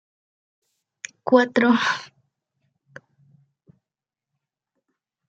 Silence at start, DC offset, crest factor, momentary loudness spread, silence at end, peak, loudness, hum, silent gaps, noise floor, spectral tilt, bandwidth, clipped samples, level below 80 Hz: 1.25 s; under 0.1%; 24 dB; 21 LU; 3.25 s; -2 dBFS; -20 LUFS; none; none; -89 dBFS; -4 dB/octave; 7.8 kHz; under 0.1%; -78 dBFS